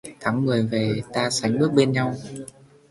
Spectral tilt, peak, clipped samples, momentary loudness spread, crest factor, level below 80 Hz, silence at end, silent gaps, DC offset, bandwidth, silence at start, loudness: -5.5 dB/octave; -4 dBFS; under 0.1%; 16 LU; 18 dB; -58 dBFS; 0.4 s; none; under 0.1%; 11.5 kHz; 0.05 s; -22 LUFS